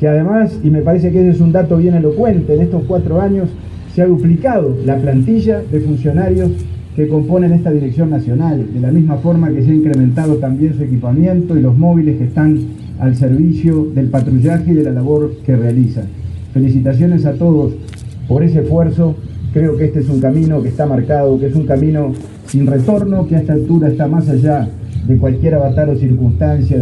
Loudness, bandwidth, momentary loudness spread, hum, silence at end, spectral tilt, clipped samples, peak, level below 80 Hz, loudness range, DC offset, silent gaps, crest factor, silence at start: -13 LUFS; 9.6 kHz; 6 LU; none; 0 s; -10.5 dB/octave; under 0.1%; 0 dBFS; -32 dBFS; 2 LU; under 0.1%; none; 10 dB; 0 s